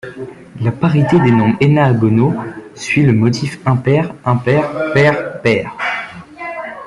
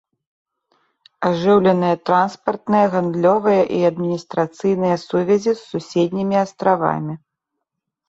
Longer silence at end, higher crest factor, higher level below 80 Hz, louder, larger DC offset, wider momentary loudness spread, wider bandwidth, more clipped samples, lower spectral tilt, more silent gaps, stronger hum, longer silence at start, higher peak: second, 0 s vs 0.9 s; about the same, 14 dB vs 16 dB; first, -48 dBFS vs -60 dBFS; first, -14 LUFS vs -18 LUFS; neither; first, 15 LU vs 9 LU; first, 11 kHz vs 8 kHz; neither; about the same, -7.5 dB/octave vs -7 dB/octave; neither; neither; second, 0.05 s vs 1.2 s; about the same, 0 dBFS vs -2 dBFS